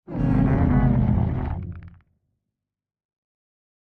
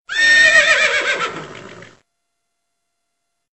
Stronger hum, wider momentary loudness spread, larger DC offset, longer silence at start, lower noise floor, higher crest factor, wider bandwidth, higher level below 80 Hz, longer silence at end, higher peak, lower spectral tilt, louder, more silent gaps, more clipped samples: neither; about the same, 15 LU vs 15 LU; neither; about the same, 0.1 s vs 0.1 s; first, -87 dBFS vs -75 dBFS; about the same, 16 dB vs 16 dB; second, 3.7 kHz vs 8.4 kHz; first, -32 dBFS vs -56 dBFS; first, 1.9 s vs 1.75 s; second, -8 dBFS vs -2 dBFS; first, -11.5 dB/octave vs 0 dB/octave; second, -22 LUFS vs -11 LUFS; neither; neither